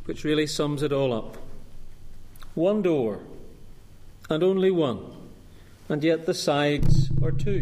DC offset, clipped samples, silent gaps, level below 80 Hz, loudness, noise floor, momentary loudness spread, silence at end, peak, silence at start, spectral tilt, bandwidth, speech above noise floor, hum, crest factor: under 0.1%; under 0.1%; none; -34 dBFS; -25 LUFS; -47 dBFS; 16 LU; 0 s; -8 dBFS; 0 s; -6.5 dB/octave; 14 kHz; 24 dB; none; 16 dB